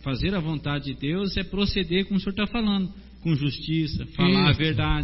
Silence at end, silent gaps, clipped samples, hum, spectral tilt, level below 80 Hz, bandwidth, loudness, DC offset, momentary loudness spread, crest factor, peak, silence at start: 0 s; none; under 0.1%; none; -9.5 dB/octave; -38 dBFS; 5.8 kHz; -25 LUFS; under 0.1%; 8 LU; 18 dB; -6 dBFS; 0 s